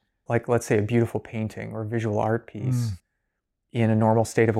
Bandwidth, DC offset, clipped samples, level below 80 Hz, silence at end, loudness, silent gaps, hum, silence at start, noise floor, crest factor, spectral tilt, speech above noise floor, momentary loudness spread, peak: 13.5 kHz; under 0.1%; under 0.1%; -60 dBFS; 0 s; -25 LUFS; none; none; 0.3 s; -79 dBFS; 18 dB; -7 dB/octave; 56 dB; 11 LU; -8 dBFS